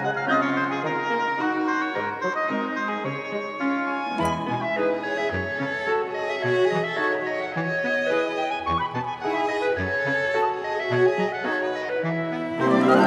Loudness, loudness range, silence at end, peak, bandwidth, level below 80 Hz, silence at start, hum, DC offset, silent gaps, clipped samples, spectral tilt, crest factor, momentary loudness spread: -25 LUFS; 2 LU; 0 s; -4 dBFS; 11 kHz; -58 dBFS; 0 s; none; under 0.1%; none; under 0.1%; -6 dB/octave; 20 dB; 5 LU